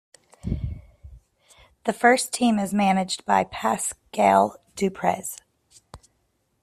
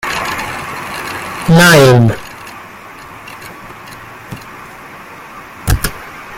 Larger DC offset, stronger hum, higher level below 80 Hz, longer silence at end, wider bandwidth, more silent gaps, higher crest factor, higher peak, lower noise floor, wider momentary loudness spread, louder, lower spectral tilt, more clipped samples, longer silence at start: neither; neither; second, -46 dBFS vs -32 dBFS; first, 0.65 s vs 0 s; second, 15 kHz vs 17 kHz; neither; first, 20 dB vs 14 dB; second, -4 dBFS vs 0 dBFS; first, -71 dBFS vs -33 dBFS; second, 15 LU vs 25 LU; second, -23 LUFS vs -12 LUFS; about the same, -4.5 dB/octave vs -5 dB/octave; neither; first, 0.45 s vs 0.05 s